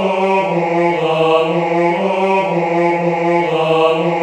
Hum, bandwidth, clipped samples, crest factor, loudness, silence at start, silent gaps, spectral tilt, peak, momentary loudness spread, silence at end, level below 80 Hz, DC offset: none; 9.4 kHz; under 0.1%; 14 dB; -15 LUFS; 0 s; none; -6.5 dB/octave; -2 dBFS; 2 LU; 0 s; -60 dBFS; under 0.1%